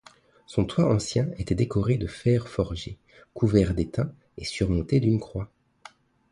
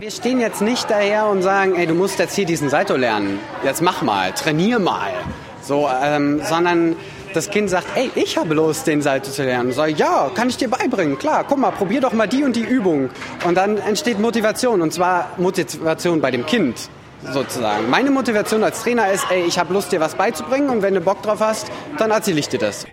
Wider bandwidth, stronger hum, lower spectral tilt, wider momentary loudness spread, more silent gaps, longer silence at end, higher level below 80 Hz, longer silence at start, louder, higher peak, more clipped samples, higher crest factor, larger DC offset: second, 11.5 kHz vs 16.5 kHz; neither; first, -7 dB/octave vs -4.5 dB/octave; first, 13 LU vs 5 LU; neither; first, 0.85 s vs 0 s; first, -42 dBFS vs -54 dBFS; first, 0.5 s vs 0 s; second, -26 LUFS vs -18 LUFS; second, -6 dBFS vs 0 dBFS; neither; about the same, 20 dB vs 18 dB; neither